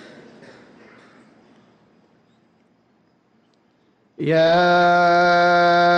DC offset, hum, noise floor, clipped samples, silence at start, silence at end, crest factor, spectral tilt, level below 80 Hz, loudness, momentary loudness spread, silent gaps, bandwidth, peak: under 0.1%; none; -61 dBFS; under 0.1%; 4.2 s; 0 s; 12 dB; -6 dB/octave; -64 dBFS; -16 LUFS; 4 LU; none; 7.4 kHz; -8 dBFS